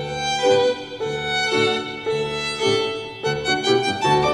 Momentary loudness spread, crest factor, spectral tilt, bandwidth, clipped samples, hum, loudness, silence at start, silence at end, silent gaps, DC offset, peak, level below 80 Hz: 8 LU; 16 dB; -3.5 dB/octave; 12.5 kHz; under 0.1%; none; -21 LUFS; 0 s; 0 s; none; under 0.1%; -6 dBFS; -50 dBFS